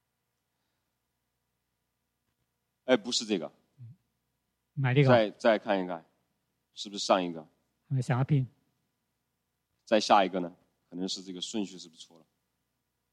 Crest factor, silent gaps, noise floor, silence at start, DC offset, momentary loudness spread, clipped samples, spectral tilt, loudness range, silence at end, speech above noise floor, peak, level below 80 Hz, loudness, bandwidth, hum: 26 dB; none; -82 dBFS; 2.85 s; under 0.1%; 19 LU; under 0.1%; -5.5 dB/octave; 6 LU; 1.1 s; 54 dB; -6 dBFS; -74 dBFS; -29 LUFS; 10.5 kHz; 60 Hz at -60 dBFS